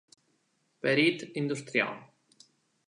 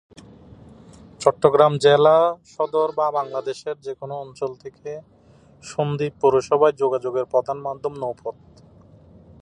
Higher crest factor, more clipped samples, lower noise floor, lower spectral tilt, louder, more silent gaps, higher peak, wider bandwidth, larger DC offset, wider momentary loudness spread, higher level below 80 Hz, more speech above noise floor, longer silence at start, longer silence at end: about the same, 20 dB vs 22 dB; neither; first, -74 dBFS vs -49 dBFS; about the same, -5 dB/octave vs -5.5 dB/octave; second, -29 LUFS vs -21 LUFS; neither; second, -12 dBFS vs 0 dBFS; about the same, 11 kHz vs 10.5 kHz; neither; second, 9 LU vs 18 LU; second, -82 dBFS vs -58 dBFS; first, 45 dB vs 29 dB; second, 0.85 s vs 1.2 s; second, 0.85 s vs 1.1 s